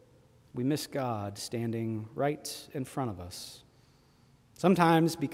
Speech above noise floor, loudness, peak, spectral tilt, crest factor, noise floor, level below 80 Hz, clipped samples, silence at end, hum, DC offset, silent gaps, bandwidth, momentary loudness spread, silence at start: 32 dB; -31 LUFS; -10 dBFS; -6 dB/octave; 22 dB; -63 dBFS; -66 dBFS; under 0.1%; 0 s; none; under 0.1%; none; 16 kHz; 17 LU; 0.55 s